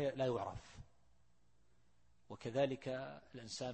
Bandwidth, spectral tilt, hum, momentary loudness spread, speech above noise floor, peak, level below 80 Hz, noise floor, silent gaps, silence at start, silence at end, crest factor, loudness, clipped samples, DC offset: 8.4 kHz; -5.5 dB/octave; none; 19 LU; 34 dB; -24 dBFS; -68 dBFS; -76 dBFS; none; 0 s; 0 s; 20 dB; -42 LUFS; under 0.1%; under 0.1%